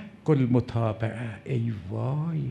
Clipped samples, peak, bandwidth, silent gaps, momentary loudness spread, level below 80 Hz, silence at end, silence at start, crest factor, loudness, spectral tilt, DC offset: under 0.1%; -10 dBFS; 9.2 kHz; none; 9 LU; -56 dBFS; 0 s; 0 s; 18 dB; -28 LUFS; -9.5 dB/octave; under 0.1%